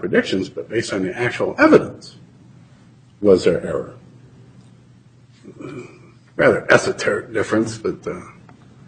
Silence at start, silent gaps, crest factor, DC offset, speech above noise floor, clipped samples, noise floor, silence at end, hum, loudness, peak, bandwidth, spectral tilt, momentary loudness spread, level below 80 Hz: 0 s; none; 20 dB; under 0.1%; 30 dB; under 0.1%; -49 dBFS; 0.55 s; none; -18 LUFS; 0 dBFS; 9.4 kHz; -5.5 dB/octave; 21 LU; -54 dBFS